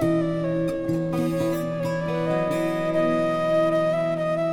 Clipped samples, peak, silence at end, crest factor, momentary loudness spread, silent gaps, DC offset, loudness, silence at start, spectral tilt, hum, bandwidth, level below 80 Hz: under 0.1%; -12 dBFS; 0 s; 12 dB; 4 LU; none; under 0.1%; -24 LUFS; 0 s; -7.5 dB/octave; none; 16.5 kHz; -52 dBFS